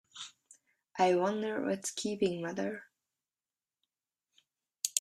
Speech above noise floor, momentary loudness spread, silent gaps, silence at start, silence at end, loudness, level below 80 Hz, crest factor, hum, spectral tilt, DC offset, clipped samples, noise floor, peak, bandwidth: over 58 dB; 18 LU; none; 0.15 s; 0 s; -33 LUFS; -78 dBFS; 28 dB; none; -3.5 dB/octave; under 0.1%; under 0.1%; under -90 dBFS; -8 dBFS; 15 kHz